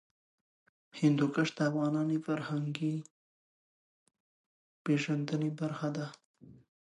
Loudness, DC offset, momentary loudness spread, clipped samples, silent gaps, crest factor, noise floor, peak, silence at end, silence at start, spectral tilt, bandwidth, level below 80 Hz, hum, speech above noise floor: -33 LUFS; under 0.1%; 11 LU; under 0.1%; 3.11-4.06 s, 4.20-4.85 s, 6.25-6.34 s; 18 dB; under -90 dBFS; -16 dBFS; 0.35 s; 0.95 s; -7 dB/octave; 11 kHz; -82 dBFS; none; over 58 dB